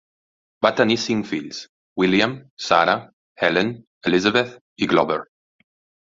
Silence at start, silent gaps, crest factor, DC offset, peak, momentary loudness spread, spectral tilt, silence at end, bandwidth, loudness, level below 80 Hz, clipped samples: 0.6 s; 1.69-1.96 s, 2.50-2.57 s, 3.13-3.36 s, 3.87-4.01 s, 4.61-4.76 s; 20 dB; under 0.1%; -2 dBFS; 11 LU; -4.5 dB/octave; 0.8 s; 7.8 kHz; -20 LUFS; -58 dBFS; under 0.1%